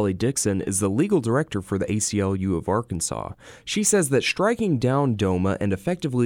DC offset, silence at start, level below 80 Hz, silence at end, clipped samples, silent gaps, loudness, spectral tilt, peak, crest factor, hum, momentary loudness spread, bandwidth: under 0.1%; 0 s; -50 dBFS; 0 s; under 0.1%; none; -23 LUFS; -5 dB/octave; -8 dBFS; 16 dB; none; 7 LU; 18 kHz